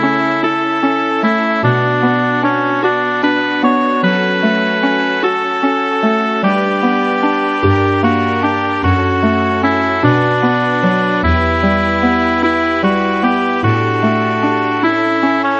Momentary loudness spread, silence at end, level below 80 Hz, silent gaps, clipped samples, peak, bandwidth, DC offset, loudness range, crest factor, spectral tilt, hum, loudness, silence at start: 2 LU; 0 s; -36 dBFS; none; under 0.1%; 0 dBFS; 8 kHz; under 0.1%; 1 LU; 14 dB; -7 dB/octave; none; -14 LUFS; 0 s